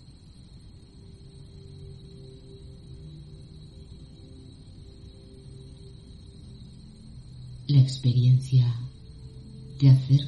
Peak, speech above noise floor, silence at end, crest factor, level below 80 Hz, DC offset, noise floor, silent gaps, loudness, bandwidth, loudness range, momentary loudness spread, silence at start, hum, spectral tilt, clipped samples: -8 dBFS; 29 dB; 0 s; 20 dB; -50 dBFS; under 0.1%; -49 dBFS; none; -22 LUFS; 9 kHz; 22 LU; 27 LU; 1.8 s; none; -8 dB/octave; under 0.1%